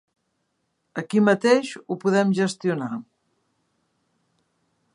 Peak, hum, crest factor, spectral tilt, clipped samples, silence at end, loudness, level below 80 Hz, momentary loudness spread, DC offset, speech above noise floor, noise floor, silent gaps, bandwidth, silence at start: -4 dBFS; none; 20 dB; -6 dB/octave; under 0.1%; 1.9 s; -22 LUFS; -76 dBFS; 15 LU; under 0.1%; 52 dB; -74 dBFS; none; 11 kHz; 0.95 s